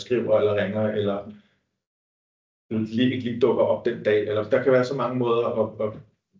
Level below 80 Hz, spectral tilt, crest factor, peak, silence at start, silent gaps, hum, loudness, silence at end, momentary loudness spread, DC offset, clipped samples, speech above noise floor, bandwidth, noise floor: -62 dBFS; -7.5 dB/octave; 16 dB; -8 dBFS; 0 s; 1.87-2.69 s; none; -23 LUFS; 0.4 s; 9 LU; under 0.1%; under 0.1%; over 67 dB; 7.6 kHz; under -90 dBFS